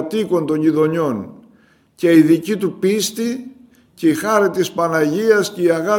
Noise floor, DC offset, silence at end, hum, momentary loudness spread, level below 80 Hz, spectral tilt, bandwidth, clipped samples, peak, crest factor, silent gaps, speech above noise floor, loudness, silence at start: -53 dBFS; under 0.1%; 0 s; none; 9 LU; -62 dBFS; -5.5 dB/octave; 17 kHz; under 0.1%; 0 dBFS; 16 dB; none; 37 dB; -17 LUFS; 0 s